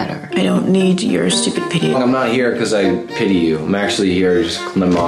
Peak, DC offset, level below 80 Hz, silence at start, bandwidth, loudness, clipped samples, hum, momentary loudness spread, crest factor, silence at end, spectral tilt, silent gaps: -4 dBFS; under 0.1%; -48 dBFS; 0 s; 12.5 kHz; -15 LUFS; under 0.1%; none; 3 LU; 10 dB; 0 s; -5 dB/octave; none